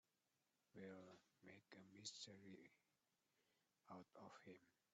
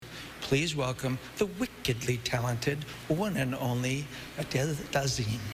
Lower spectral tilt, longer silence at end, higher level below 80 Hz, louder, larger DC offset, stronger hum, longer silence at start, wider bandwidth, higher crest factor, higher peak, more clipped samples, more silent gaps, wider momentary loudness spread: second, -3 dB/octave vs -5 dB/octave; first, 0.2 s vs 0 s; second, under -90 dBFS vs -54 dBFS; second, -62 LUFS vs -31 LUFS; neither; neither; first, 0.75 s vs 0 s; second, 7.6 kHz vs 16 kHz; first, 22 dB vs 16 dB; second, -42 dBFS vs -14 dBFS; neither; neither; first, 12 LU vs 6 LU